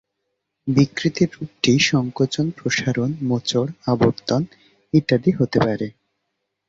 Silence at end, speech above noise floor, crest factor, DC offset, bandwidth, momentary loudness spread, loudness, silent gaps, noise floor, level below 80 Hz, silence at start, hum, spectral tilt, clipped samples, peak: 0.75 s; 57 dB; 18 dB; under 0.1%; 7.8 kHz; 6 LU; -20 LUFS; none; -77 dBFS; -52 dBFS; 0.65 s; none; -5.5 dB/octave; under 0.1%; -2 dBFS